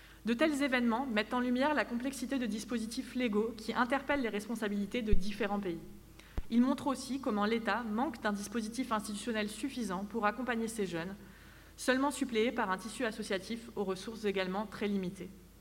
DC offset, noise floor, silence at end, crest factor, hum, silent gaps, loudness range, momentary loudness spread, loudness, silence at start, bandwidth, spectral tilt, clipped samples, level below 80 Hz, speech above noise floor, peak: under 0.1%; -55 dBFS; 0 s; 20 dB; none; none; 2 LU; 8 LU; -35 LUFS; 0 s; 16 kHz; -4.5 dB/octave; under 0.1%; -48 dBFS; 21 dB; -14 dBFS